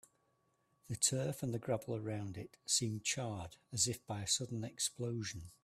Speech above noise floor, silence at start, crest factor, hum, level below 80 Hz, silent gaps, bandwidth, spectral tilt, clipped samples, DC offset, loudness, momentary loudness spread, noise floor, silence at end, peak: 39 dB; 0.9 s; 24 dB; none; -70 dBFS; none; 15.5 kHz; -3 dB/octave; under 0.1%; under 0.1%; -38 LUFS; 11 LU; -78 dBFS; 0.1 s; -16 dBFS